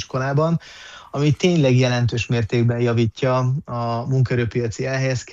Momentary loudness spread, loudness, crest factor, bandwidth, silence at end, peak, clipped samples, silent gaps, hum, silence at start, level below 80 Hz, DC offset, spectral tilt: 8 LU; -20 LUFS; 14 dB; 7.6 kHz; 0 s; -6 dBFS; under 0.1%; none; none; 0 s; -50 dBFS; under 0.1%; -6.5 dB/octave